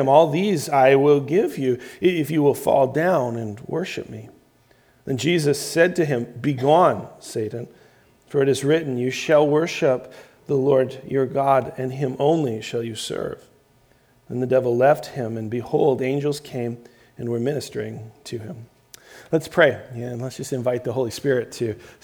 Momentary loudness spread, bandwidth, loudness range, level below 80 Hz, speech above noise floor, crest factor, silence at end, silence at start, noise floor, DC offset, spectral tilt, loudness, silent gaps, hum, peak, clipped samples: 14 LU; over 20 kHz; 5 LU; -62 dBFS; 37 dB; 20 dB; 0.15 s; 0 s; -58 dBFS; under 0.1%; -6 dB/octave; -21 LUFS; none; none; -2 dBFS; under 0.1%